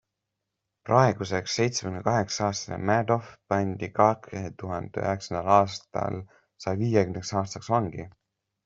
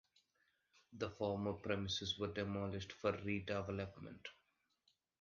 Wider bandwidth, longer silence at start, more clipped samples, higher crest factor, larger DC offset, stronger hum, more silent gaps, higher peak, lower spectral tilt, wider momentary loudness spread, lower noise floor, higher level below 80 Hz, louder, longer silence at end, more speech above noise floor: first, 8 kHz vs 7.2 kHz; about the same, 0.85 s vs 0.9 s; neither; about the same, 22 dB vs 20 dB; neither; neither; neither; first, -4 dBFS vs -24 dBFS; first, -5.5 dB/octave vs -4 dB/octave; about the same, 13 LU vs 13 LU; about the same, -84 dBFS vs -82 dBFS; about the same, -60 dBFS vs -64 dBFS; first, -27 LUFS vs -43 LUFS; second, 0.55 s vs 0.85 s; first, 58 dB vs 39 dB